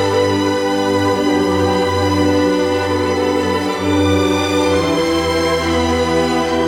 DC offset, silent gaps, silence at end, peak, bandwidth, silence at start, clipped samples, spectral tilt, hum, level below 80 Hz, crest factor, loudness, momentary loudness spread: under 0.1%; none; 0 s; -4 dBFS; 16.5 kHz; 0 s; under 0.1%; -5 dB/octave; none; -38 dBFS; 12 dB; -15 LUFS; 2 LU